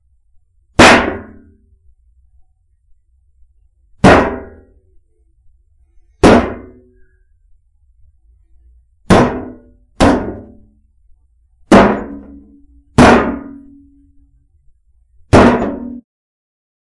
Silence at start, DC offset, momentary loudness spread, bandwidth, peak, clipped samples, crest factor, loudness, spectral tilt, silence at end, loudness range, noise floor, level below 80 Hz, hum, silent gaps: 0.8 s; under 0.1%; 22 LU; 12 kHz; 0 dBFS; 0.3%; 16 dB; -11 LUFS; -5.5 dB/octave; 1 s; 4 LU; -53 dBFS; -32 dBFS; none; none